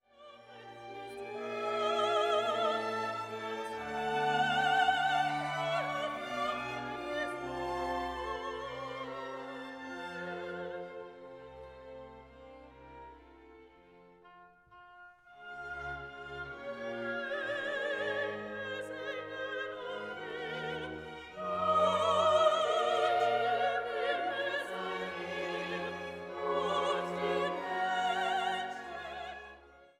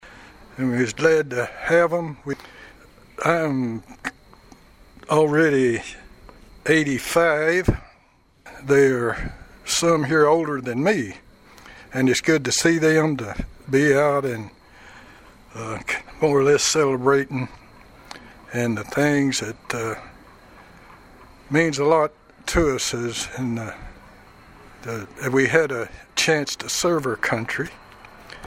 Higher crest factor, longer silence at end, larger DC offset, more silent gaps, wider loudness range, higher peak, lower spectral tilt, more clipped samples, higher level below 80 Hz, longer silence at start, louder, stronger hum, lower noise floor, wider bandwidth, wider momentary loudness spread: about the same, 20 dB vs 22 dB; first, 0.15 s vs 0 s; neither; neither; first, 17 LU vs 5 LU; second, -16 dBFS vs -2 dBFS; about the same, -4 dB/octave vs -4.5 dB/octave; neither; second, -64 dBFS vs -44 dBFS; first, 0.2 s vs 0.05 s; second, -34 LUFS vs -21 LUFS; neither; about the same, -59 dBFS vs -57 dBFS; second, 14 kHz vs 16 kHz; first, 21 LU vs 16 LU